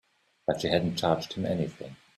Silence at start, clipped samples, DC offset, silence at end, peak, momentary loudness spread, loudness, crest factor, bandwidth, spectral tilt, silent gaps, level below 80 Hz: 0.5 s; under 0.1%; under 0.1%; 0.2 s; -10 dBFS; 8 LU; -29 LUFS; 20 dB; 13.5 kHz; -6 dB/octave; none; -60 dBFS